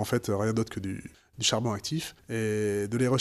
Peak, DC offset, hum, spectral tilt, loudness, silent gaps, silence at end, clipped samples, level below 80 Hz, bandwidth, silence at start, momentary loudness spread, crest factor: -10 dBFS; under 0.1%; none; -4.5 dB/octave; -29 LUFS; none; 0 s; under 0.1%; -58 dBFS; 15 kHz; 0 s; 10 LU; 18 dB